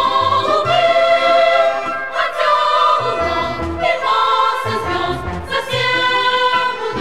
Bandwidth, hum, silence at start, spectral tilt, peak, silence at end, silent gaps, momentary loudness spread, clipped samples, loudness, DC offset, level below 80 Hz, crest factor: 14 kHz; none; 0 s; -4 dB/octave; -2 dBFS; 0 s; none; 8 LU; under 0.1%; -15 LUFS; 1%; -40 dBFS; 12 dB